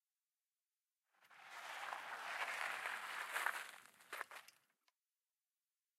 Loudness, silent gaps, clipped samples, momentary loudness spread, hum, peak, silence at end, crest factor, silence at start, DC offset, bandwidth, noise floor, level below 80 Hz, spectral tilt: -46 LUFS; none; under 0.1%; 14 LU; none; -22 dBFS; 1.5 s; 28 dB; 1.2 s; under 0.1%; 16 kHz; under -90 dBFS; under -90 dBFS; 1 dB/octave